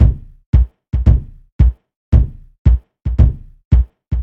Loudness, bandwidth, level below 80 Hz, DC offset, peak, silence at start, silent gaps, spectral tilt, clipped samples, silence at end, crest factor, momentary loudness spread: -17 LUFS; 3.3 kHz; -16 dBFS; 0.1%; 0 dBFS; 0 s; 0.46-0.53 s, 1.52-1.59 s, 1.96-2.12 s, 2.58-2.65 s, 3.65-3.71 s; -10.5 dB/octave; under 0.1%; 0 s; 14 dB; 7 LU